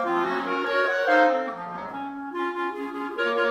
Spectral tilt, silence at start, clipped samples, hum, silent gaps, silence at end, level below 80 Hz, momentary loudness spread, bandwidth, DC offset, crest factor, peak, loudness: -4.5 dB/octave; 0 s; under 0.1%; none; none; 0 s; -70 dBFS; 14 LU; 13.5 kHz; under 0.1%; 18 dB; -6 dBFS; -25 LUFS